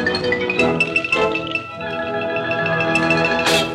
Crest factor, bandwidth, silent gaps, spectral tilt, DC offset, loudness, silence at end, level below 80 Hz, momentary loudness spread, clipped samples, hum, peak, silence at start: 16 dB; 16.5 kHz; none; -4 dB/octave; under 0.1%; -18 LUFS; 0 s; -50 dBFS; 8 LU; under 0.1%; none; -4 dBFS; 0 s